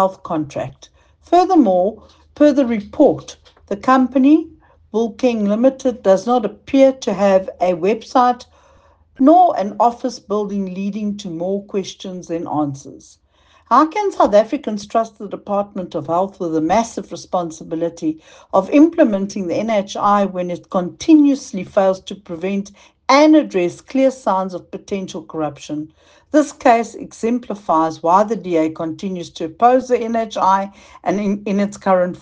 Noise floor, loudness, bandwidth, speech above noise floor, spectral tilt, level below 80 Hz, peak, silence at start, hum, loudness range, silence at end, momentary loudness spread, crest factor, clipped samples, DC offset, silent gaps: -51 dBFS; -17 LUFS; 9 kHz; 35 dB; -6 dB/octave; -56 dBFS; 0 dBFS; 0 s; none; 5 LU; 0.05 s; 13 LU; 16 dB; under 0.1%; under 0.1%; none